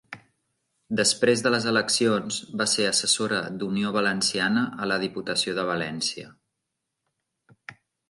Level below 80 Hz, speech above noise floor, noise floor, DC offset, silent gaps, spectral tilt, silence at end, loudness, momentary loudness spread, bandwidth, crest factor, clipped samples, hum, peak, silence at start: -68 dBFS; 57 dB; -82 dBFS; under 0.1%; none; -3 dB/octave; 0.35 s; -24 LUFS; 8 LU; 11.5 kHz; 20 dB; under 0.1%; none; -6 dBFS; 0.1 s